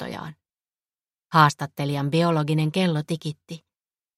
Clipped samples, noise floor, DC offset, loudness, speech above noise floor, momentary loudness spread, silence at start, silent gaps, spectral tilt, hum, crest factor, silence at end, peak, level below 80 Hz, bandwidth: under 0.1%; under -90 dBFS; under 0.1%; -22 LUFS; over 68 dB; 21 LU; 0 s; none; -6 dB/octave; none; 22 dB; 0.6 s; -4 dBFS; -64 dBFS; 13 kHz